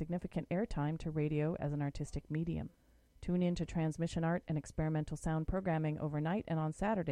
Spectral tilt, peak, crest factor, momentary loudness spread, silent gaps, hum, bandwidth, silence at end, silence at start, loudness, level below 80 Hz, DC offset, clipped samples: -7.5 dB/octave; -22 dBFS; 14 dB; 5 LU; none; none; 11 kHz; 0 s; 0 s; -37 LUFS; -52 dBFS; under 0.1%; under 0.1%